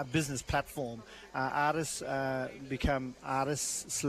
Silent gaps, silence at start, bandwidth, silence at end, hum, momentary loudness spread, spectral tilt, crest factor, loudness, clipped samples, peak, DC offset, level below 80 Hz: none; 0 s; 15 kHz; 0 s; none; 9 LU; -4 dB/octave; 14 dB; -34 LUFS; under 0.1%; -20 dBFS; under 0.1%; -50 dBFS